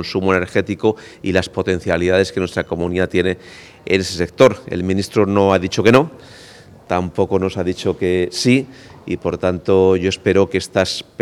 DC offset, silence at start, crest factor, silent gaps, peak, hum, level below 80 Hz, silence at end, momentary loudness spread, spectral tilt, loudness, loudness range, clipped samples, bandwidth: under 0.1%; 0 s; 18 dB; none; 0 dBFS; none; -46 dBFS; 0.2 s; 9 LU; -5.5 dB/octave; -17 LUFS; 3 LU; under 0.1%; 14 kHz